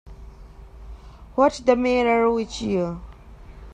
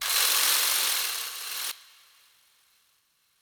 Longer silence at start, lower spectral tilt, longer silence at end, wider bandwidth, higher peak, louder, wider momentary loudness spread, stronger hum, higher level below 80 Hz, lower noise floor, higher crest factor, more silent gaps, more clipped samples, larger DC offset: about the same, 0.05 s vs 0 s; first, -5.5 dB/octave vs 4 dB/octave; second, 0 s vs 1.6 s; second, 9.6 kHz vs over 20 kHz; first, -4 dBFS vs -8 dBFS; first, -21 LUFS vs -24 LUFS; first, 24 LU vs 12 LU; neither; first, -42 dBFS vs -70 dBFS; second, -43 dBFS vs -69 dBFS; about the same, 20 dB vs 22 dB; neither; neither; neither